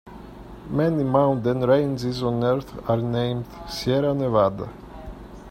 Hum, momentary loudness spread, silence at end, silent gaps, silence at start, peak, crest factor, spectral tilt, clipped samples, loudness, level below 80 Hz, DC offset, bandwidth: none; 20 LU; 0 s; none; 0.05 s; -4 dBFS; 18 dB; -7.5 dB/octave; under 0.1%; -23 LUFS; -46 dBFS; under 0.1%; 16 kHz